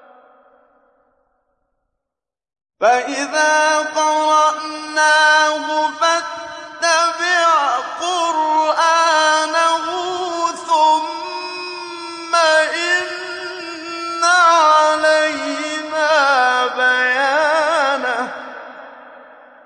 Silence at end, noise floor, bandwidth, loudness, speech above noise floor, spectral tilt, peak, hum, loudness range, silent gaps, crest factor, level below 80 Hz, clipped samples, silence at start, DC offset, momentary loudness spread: 0.4 s; -85 dBFS; 11 kHz; -15 LUFS; 70 dB; 0 dB/octave; -4 dBFS; none; 4 LU; none; 14 dB; -70 dBFS; under 0.1%; 2.8 s; under 0.1%; 14 LU